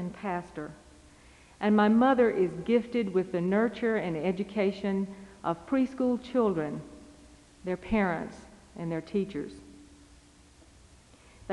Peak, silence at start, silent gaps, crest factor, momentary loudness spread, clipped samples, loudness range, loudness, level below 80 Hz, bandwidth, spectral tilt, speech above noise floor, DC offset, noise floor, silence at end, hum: -12 dBFS; 0 s; none; 18 dB; 18 LU; under 0.1%; 8 LU; -29 LUFS; -56 dBFS; 11 kHz; -7.5 dB/octave; 29 dB; under 0.1%; -57 dBFS; 0 s; none